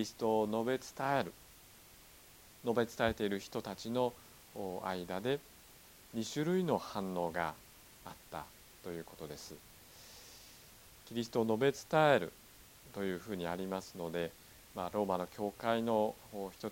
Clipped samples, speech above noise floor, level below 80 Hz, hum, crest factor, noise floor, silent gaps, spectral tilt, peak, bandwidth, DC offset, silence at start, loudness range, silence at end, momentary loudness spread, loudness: under 0.1%; 23 dB; -66 dBFS; none; 24 dB; -59 dBFS; none; -5.5 dB/octave; -14 dBFS; 17.5 kHz; under 0.1%; 0 s; 9 LU; 0 s; 23 LU; -37 LUFS